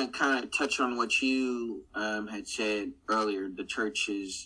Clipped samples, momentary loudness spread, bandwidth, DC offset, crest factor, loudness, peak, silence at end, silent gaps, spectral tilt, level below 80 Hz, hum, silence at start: under 0.1%; 9 LU; 10.5 kHz; under 0.1%; 18 dB; -30 LUFS; -14 dBFS; 0 s; none; -2.5 dB/octave; -64 dBFS; none; 0 s